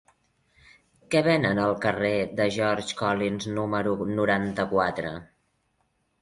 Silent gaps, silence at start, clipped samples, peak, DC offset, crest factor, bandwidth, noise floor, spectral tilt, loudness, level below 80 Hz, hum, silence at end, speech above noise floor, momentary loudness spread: none; 1.1 s; under 0.1%; -8 dBFS; under 0.1%; 20 dB; 11.5 kHz; -72 dBFS; -5.5 dB/octave; -25 LUFS; -56 dBFS; none; 0.95 s; 47 dB; 6 LU